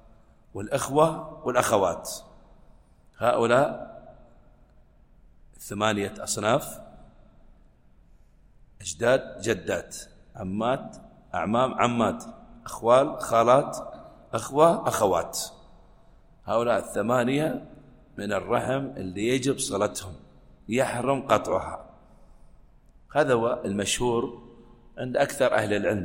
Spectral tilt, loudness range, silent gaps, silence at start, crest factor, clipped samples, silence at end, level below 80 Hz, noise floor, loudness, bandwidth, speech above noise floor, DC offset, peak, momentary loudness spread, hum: -4.5 dB/octave; 7 LU; none; 0.55 s; 22 dB; under 0.1%; 0 s; -54 dBFS; -56 dBFS; -25 LUFS; 16.5 kHz; 31 dB; under 0.1%; -4 dBFS; 18 LU; none